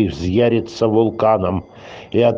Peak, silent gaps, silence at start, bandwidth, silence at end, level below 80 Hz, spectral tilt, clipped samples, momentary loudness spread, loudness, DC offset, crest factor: -2 dBFS; none; 0 s; 7.6 kHz; 0 s; -46 dBFS; -7.5 dB/octave; under 0.1%; 12 LU; -17 LUFS; under 0.1%; 14 dB